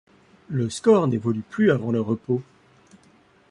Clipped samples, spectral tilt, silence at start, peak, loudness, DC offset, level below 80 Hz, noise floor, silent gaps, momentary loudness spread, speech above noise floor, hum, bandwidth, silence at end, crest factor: under 0.1%; -7 dB/octave; 0.5 s; -6 dBFS; -23 LUFS; under 0.1%; -60 dBFS; -57 dBFS; none; 9 LU; 35 dB; none; 11 kHz; 1.1 s; 18 dB